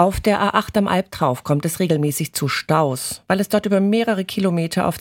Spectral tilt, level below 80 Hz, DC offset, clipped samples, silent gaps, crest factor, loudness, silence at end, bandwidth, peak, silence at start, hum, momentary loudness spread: -5.5 dB/octave; -44 dBFS; under 0.1%; under 0.1%; none; 18 dB; -19 LUFS; 0 s; 17 kHz; -2 dBFS; 0 s; none; 4 LU